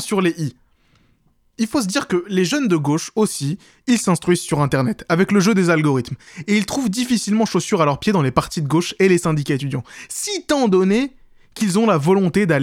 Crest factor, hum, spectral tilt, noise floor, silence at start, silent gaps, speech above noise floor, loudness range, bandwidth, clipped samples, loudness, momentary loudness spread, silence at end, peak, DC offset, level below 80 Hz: 18 dB; none; -5.5 dB/octave; -59 dBFS; 0 s; none; 41 dB; 3 LU; 16 kHz; under 0.1%; -18 LUFS; 10 LU; 0 s; 0 dBFS; under 0.1%; -50 dBFS